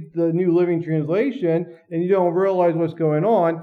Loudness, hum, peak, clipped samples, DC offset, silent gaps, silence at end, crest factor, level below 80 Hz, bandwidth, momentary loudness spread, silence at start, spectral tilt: -20 LUFS; none; -6 dBFS; under 0.1%; under 0.1%; none; 0 s; 12 dB; -78 dBFS; 4.8 kHz; 4 LU; 0 s; -10 dB/octave